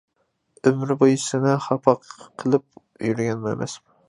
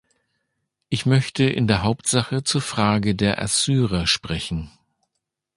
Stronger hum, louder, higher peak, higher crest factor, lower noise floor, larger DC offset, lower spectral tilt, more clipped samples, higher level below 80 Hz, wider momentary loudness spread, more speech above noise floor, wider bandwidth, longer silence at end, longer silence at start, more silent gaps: neither; about the same, -22 LUFS vs -21 LUFS; about the same, -2 dBFS vs -2 dBFS; about the same, 22 dB vs 20 dB; second, -61 dBFS vs -80 dBFS; neither; first, -6 dB/octave vs -4.5 dB/octave; neither; second, -64 dBFS vs -42 dBFS; first, 11 LU vs 8 LU; second, 39 dB vs 59 dB; about the same, 11 kHz vs 11.5 kHz; second, 0.3 s vs 0.9 s; second, 0.65 s vs 0.9 s; neither